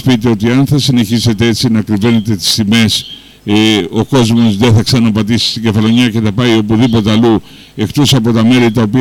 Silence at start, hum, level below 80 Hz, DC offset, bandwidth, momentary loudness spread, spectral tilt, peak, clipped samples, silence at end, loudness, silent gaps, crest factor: 0 s; none; -38 dBFS; under 0.1%; 16.5 kHz; 4 LU; -5.5 dB/octave; -2 dBFS; under 0.1%; 0 s; -10 LUFS; none; 8 dB